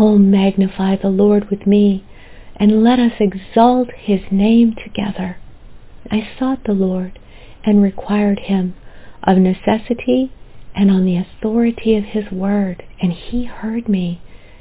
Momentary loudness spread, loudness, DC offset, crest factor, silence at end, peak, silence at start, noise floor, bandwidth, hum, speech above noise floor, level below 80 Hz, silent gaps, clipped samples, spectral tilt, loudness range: 11 LU; -16 LUFS; under 0.1%; 16 dB; 0.25 s; 0 dBFS; 0 s; -36 dBFS; 4 kHz; none; 21 dB; -40 dBFS; none; under 0.1%; -12 dB/octave; 5 LU